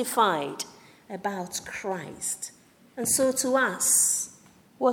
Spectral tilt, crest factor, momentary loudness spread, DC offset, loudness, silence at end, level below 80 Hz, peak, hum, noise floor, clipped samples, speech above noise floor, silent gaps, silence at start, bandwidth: -2 dB/octave; 18 dB; 17 LU; under 0.1%; -25 LUFS; 0 s; -68 dBFS; -8 dBFS; none; -46 dBFS; under 0.1%; 20 dB; none; 0 s; 19.5 kHz